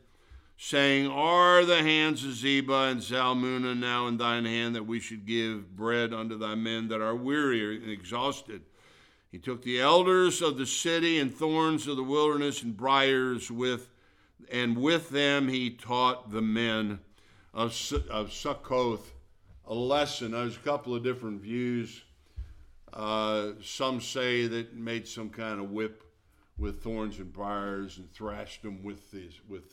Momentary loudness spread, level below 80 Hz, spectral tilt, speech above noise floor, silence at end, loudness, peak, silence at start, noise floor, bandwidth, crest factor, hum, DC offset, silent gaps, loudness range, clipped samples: 16 LU; -52 dBFS; -4 dB/octave; 35 dB; 0.1 s; -29 LUFS; -8 dBFS; 0.3 s; -64 dBFS; 16 kHz; 22 dB; none; under 0.1%; none; 9 LU; under 0.1%